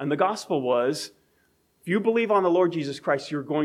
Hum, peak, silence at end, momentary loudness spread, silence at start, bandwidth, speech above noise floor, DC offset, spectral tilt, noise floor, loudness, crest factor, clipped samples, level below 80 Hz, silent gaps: none; -8 dBFS; 0 s; 9 LU; 0 s; 14.5 kHz; 43 dB; under 0.1%; -5.5 dB/octave; -66 dBFS; -24 LUFS; 16 dB; under 0.1%; -76 dBFS; none